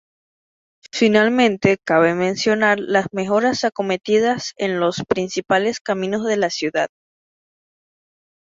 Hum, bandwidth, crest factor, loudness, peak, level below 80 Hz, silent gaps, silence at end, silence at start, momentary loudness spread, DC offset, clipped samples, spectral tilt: none; 7.8 kHz; 18 dB; -19 LUFS; -2 dBFS; -60 dBFS; 5.81-5.85 s; 1.6 s; 0.95 s; 7 LU; under 0.1%; under 0.1%; -4.5 dB/octave